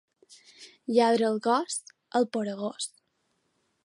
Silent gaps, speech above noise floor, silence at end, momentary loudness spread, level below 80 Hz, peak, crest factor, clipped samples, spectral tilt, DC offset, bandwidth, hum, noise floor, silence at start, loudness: none; 48 dB; 1 s; 13 LU; -82 dBFS; -10 dBFS; 20 dB; under 0.1%; -4 dB/octave; under 0.1%; 11.5 kHz; none; -75 dBFS; 0.6 s; -28 LUFS